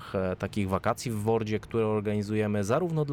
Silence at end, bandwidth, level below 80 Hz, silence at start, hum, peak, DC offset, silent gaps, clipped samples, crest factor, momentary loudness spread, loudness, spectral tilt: 0 s; 16.5 kHz; -56 dBFS; 0 s; none; -14 dBFS; under 0.1%; none; under 0.1%; 14 dB; 3 LU; -29 LUFS; -7 dB/octave